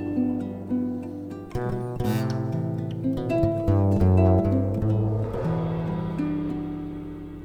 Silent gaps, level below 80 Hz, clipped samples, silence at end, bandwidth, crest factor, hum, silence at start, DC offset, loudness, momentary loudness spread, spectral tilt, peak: none; -42 dBFS; under 0.1%; 0 s; 15 kHz; 16 dB; none; 0 s; under 0.1%; -26 LUFS; 13 LU; -9.5 dB/octave; -8 dBFS